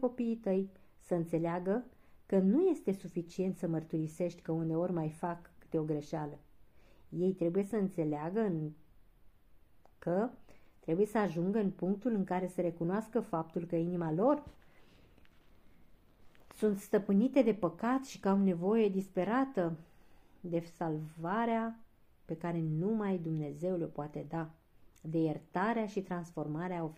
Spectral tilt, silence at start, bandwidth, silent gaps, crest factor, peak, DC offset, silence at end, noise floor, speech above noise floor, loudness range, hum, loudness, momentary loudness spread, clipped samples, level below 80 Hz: -8 dB/octave; 0 s; 15 kHz; none; 18 dB; -16 dBFS; under 0.1%; 0 s; -60 dBFS; 27 dB; 6 LU; none; -35 LUFS; 10 LU; under 0.1%; -68 dBFS